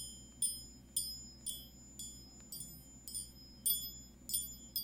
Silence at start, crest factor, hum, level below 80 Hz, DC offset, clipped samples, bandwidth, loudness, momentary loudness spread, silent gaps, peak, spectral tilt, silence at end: 0 s; 24 dB; none; -62 dBFS; under 0.1%; under 0.1%; 18 kHz; -40 LUFS; 15 LU; none; -20 dBFS; -1 dB/octave; 0 s